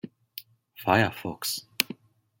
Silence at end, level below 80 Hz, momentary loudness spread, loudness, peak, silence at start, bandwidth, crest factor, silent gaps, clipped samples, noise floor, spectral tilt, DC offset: 0.45 s; -66 dBFS; 20 LU; -27 LUFS; 0 dBFS; 0.05 s; 17 kHz; 30 dB; none; under 0.1%; -48 dBFS; -4 dB/octave; under 0.1%